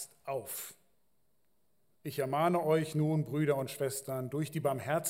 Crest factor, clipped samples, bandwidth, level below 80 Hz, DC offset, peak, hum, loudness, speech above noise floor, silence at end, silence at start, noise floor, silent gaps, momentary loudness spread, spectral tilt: 18 dB; under 0.1%; 16 kHz; -78 dBFS; under 0.1%; -16 dBFS; none; -34 LUFS; 46 dB; 0 s; 0 s; -79 dBFS; none; 11 LU; -5.5 dB/octave